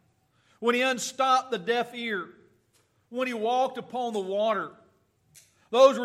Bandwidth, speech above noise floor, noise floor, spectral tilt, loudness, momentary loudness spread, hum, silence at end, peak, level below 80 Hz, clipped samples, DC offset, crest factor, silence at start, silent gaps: 14 kHz; 42 dB; -68 dBFS; -3 dB/octave; -27 LUFS; 9 LU; none; 0 s; -6 dBFS; -82 dBFS; under 0.1%; under 0.1%; 22 dB; 0.6 s; none